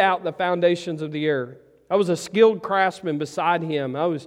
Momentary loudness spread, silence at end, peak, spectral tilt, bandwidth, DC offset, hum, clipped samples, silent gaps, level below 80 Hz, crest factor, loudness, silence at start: 9 LU; 0 s; -4 dBFS; -5.5 dB/octave; 12.5 kHz; under 0.1%; none; under 0.1%; none; -68 dBFS; 18 dB; -22 LUFS; 0 s